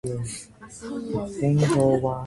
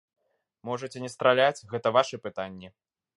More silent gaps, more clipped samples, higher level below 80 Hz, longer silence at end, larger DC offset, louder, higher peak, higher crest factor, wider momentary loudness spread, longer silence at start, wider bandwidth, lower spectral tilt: neither; neither; first, -50 dBFS vs -70 dBFS; second, 0 s vs 0.5 s; neither; first, -24 LUFS vs -27 LUFS; about the same, -8 dBFS vs -6 dBFS; second, 16 dB vs 22 dB; about the same, 18 LU vs 16 LU; second, 0.05 s vs 0.65 s; about the same, 11.5 kHz vs 11.5 kHz; first, -7 dB/octave vs -4.5 dB/octave